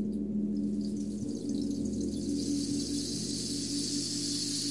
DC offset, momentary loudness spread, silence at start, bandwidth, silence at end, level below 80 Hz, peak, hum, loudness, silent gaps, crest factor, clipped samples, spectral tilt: 0.2%; 3 LU; 0 s; 11.5 kHz; 0 s; -54 dBFS; -20 dBFS; none; -33 LUFS; none; 12 dB; under 0.1%; -4 dB/octave